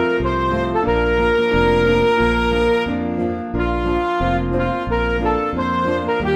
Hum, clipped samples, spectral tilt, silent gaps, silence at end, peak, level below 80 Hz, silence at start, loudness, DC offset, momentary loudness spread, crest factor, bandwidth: none; under 0.1%; -7 dB/octave; none; 0 s; -4 dBFS; -28 dBFS; 0 s; -18 LUFS; under 0.1%; 6 LU; 14 dB; 9.4 kHz